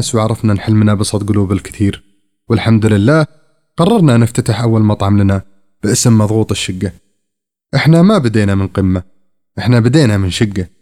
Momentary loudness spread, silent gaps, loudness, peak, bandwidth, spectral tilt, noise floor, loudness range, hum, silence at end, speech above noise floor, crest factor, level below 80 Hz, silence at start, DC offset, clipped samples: 10 LU; none; -12 LUFS; 0 dBFS; 14 kHz; -6 dB/octave; -75 dBFS; 2 LU; none; 0.15 s; 64 dB; 12 dB; -42 dBFS; 0 s; under 0.1%; under 0.1%